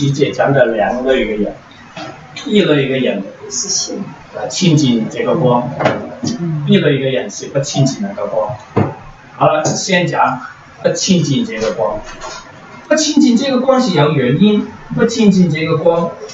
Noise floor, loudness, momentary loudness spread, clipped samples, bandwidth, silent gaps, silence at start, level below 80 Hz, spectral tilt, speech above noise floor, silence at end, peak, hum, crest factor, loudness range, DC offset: -35 dBFS; -14 LUFS; 14 LU; under 0.1%; 8 kHz; none; 0 s; -44 dBFS; -5 dB/octave; 21 dB; 0 s; 0 dBFS; none; 14 dB; 4 LU; under 0.1%